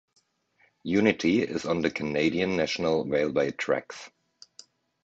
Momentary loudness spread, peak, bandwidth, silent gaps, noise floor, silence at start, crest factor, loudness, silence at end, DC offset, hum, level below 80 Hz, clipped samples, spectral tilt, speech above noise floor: 6 LU; -6 dBFS; 8 kHz; none; -67 dBFS; 0.85 s; 22 dB; -26 LUFS; 0.95 s; under 0.1%; none; -58 dBFS; under 0.1%; -5.5 dB/octave; 41 dB